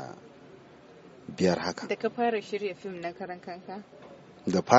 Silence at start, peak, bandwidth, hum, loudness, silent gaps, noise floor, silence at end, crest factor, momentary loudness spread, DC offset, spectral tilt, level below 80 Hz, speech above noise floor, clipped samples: 0 s; -4 dBFS; 8 kHz; none; -32 LUFS; none; -52 dBFS; 0 s; 28 dB; 24 LU; under 0.1%; -4.5 dB/octave; -70 dBFS; 24 dB; under 0.1%